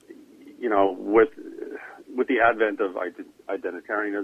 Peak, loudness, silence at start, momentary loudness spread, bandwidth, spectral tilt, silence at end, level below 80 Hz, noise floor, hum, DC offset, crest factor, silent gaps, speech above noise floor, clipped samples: -6 dBFS; -24 LUFS; 0.1 s; 17 LU; 5.6 kHz; -6.5 dB/octave; 0 s; -62 dBFS; -47 dBFS; none; under 0.1%; 20 dB; none; 24 dB; under 0.1%